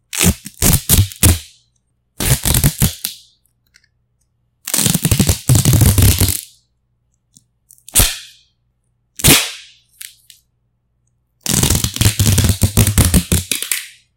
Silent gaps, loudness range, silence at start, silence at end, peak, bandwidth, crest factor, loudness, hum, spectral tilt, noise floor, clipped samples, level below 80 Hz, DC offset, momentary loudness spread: none; 3 LU; 0.15 s; 0.3 s; 0 dBFS; 17.5 kHz; 16 dB; -14 LUFS; none; -3.5 dB/octave; -65 dBFS; under 0.1%; -26 dBFS; under 0.1%; 14 LU